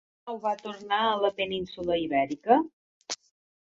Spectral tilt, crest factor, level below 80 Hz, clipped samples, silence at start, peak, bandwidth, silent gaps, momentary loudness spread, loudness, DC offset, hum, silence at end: -4 dB/octave; 22 dB; -64 dBFS; under 0.1%; 0.25 s; -8 dBFS; 8 kHz; 2.73-3.01 s; 13 LU; -28 LUFS; under 0.1%; none; 0.45 s